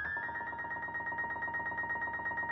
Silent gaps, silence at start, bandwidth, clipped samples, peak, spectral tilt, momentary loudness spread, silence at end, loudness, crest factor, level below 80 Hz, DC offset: none; 0 s; 6 kHz; under 0.1%; -28 dBFS; -6.5 dB/octave; 3 LU; 0 s; -36 LUFS; 10 dB; -62 dBFS; under 0.1%